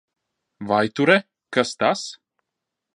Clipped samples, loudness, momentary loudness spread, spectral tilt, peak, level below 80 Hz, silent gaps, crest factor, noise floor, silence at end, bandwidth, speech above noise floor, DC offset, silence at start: under 0.1%; -21 LUFS; 13 LU; -4.5 dB/octave; -2 dBFS; -68 dBFS; none; 22 dB; -83 dBFS; 0.8 s; 11.5 kHz; 63 dB; under 0.1%; 0.6 s